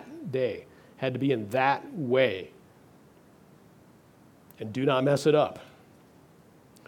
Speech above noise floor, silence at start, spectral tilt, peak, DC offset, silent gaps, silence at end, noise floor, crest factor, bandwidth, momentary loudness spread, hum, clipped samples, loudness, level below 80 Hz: 30 dB; 0 s; -6 dB/octave; -10 dBFS; under 0.1%; none; 1.25 s; -57 dBFS; 20 dB; 18.5 kHz; 16 LU; none; under 0.1%; -27 LUFS; -72 dBFS